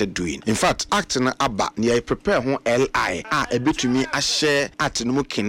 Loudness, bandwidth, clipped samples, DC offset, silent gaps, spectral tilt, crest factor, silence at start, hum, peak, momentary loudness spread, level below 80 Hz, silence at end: -21 LUFS; 16.5 kHz; under 0.1%; under 0.1%; none; -3.5 dB/octave; 12 dB; 0 s; none; -8 dBFS; 4 LU; -44 dBFS; 0 s